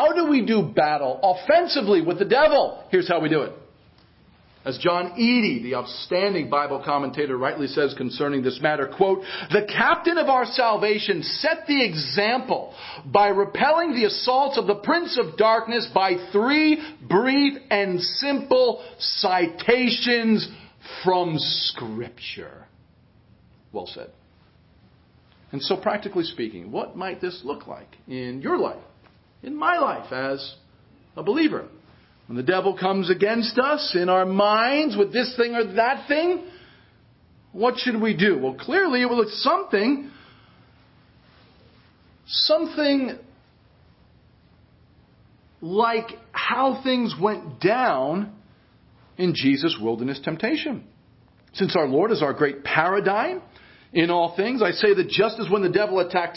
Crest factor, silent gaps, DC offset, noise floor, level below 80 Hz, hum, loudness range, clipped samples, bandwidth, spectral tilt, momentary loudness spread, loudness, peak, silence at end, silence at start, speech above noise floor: 22 dB; none; under 0.1%; -56 dBFS; -62 dBFS; none; 8 LU; under 0.1%; 5.8 kHz; -8.5 dB/octave; 13 LU; -22 LUFS; -2 dBFS; 0 s; 0 s; 34 dB